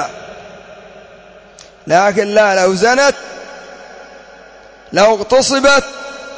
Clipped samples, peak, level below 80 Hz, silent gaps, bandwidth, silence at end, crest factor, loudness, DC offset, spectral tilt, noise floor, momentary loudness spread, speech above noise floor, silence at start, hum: under 0.1%; 0 dBFS; -48 dBFS; none; 8 kHz; 0 s; 16 dB; -12 LUFS; under 0.1%; -3 dB/octave; -40 dBFS; 23 LU; 29 dB; 0 s; none